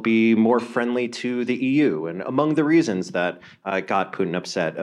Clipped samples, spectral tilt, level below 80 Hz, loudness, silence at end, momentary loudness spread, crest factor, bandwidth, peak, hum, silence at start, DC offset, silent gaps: under 0.1%; -6 dB/octave; -72 dBFS; -22 LUFS; 0 s; 9 LU; 16 dB; 10.5 kHz; -6 dBFS; none; 0 s; under 0.1%; none